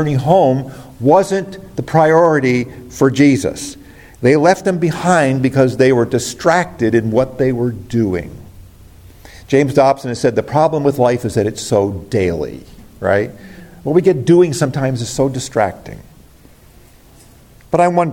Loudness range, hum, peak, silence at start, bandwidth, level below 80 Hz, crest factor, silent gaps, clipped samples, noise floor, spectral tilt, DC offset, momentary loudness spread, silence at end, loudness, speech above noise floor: 4 LU; none; 0 dBFS; 0 s; 17 kHz; -44 dBFS; 14 dB; none; under 0.1%; -44 dBFS; -6.5 dB/octave; under 0.1%; 11 LU; 0 s; -15 LUFS; 30 dB